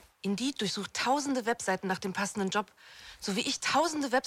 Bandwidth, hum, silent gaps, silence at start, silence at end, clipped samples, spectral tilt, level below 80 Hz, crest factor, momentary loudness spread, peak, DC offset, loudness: 16 kHz; none; none; 0.25 s; 0.05 s; under 0.1%; -3.5 dB/octave; -68 dBFS; 18 dB; 8 LU; -14 dBFS; under 0.1%; -31 LUFS